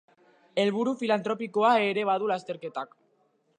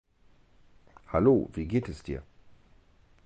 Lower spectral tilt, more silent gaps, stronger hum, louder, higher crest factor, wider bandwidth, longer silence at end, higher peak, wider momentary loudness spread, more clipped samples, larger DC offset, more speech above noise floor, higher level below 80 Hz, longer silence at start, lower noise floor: second, -5.5 dB/octave vs -9 dB/octave; neither; neither; about the same, -27 LUFS vs -28 LUFS; about the same, 18 dB vs 20 dB; first, 9.8 kHz vs 8.8 kHz; second, 0.75 s vs 1.05 s; about the same, -12 dBFS vs -12 dBFS; second, 13 LU vs 16 LU; neither; neither; first, 43 dB vs 34 dB; second, -84 dBFS vs -48 dBFS; second, 0.55 s vs 1.1 s; first, -69 dBFS vs -61 dBFS